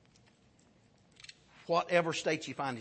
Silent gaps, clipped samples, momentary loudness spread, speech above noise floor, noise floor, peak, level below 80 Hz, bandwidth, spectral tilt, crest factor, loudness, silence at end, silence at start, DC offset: none; under 0.1%; 23 LU; 34 dB; -66 dBFS; -14 dBFS; -76 dBFS; 8.4 kHz; -4 dB/octave; 22 dB; -32 LUFS; 0 s; 1.6 s; under 0.1%